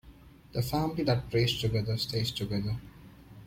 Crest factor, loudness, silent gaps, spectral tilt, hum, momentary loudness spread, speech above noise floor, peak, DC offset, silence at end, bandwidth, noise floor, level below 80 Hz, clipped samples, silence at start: 16 dB; -31 LUFS; none; -6 dB/octave; none; 8 LU; 23 dB; -16 dBFS; under 0.1%; 0 s; 16.5 kHz; -53 dBFS; -50 dBFS; under 0.1%; 0.05 s